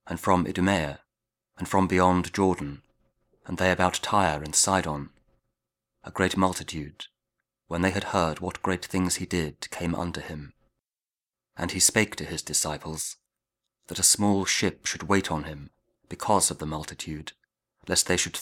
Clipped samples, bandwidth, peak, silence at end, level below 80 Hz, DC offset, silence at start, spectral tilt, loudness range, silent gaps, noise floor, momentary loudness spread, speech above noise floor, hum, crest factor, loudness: under 0.1%; 18.5 kHz; -6 dBFS; 0 s; -52 dBFS; under 0.1%; 0.05 s; -3.5 dB/octave; 5 LU; none; under -90 dBFS; 17 LU; over 64 dB; none; 22 dB; -25 LUFS